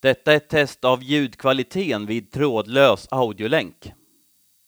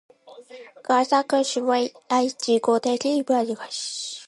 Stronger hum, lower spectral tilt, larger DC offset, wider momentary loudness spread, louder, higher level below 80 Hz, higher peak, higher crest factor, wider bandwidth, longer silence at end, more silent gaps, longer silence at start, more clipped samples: neither; first, -5.5 dB/octave vs -2.5 dB/octave; neither; about the same, 7 LU vs 9 LU; first, -20 LUFS vs -23 LUFS; first, -58 dBFS vs -78 dBFS; first, -2 dBFS vs -8 dBFS; about the same, 18 dB vs 16 dB; first, over 20 kHz vs 11.5 kHz; first, 0.75 s vs 0.05 s; neither; second, 0.05 s vs 0.25 s; neither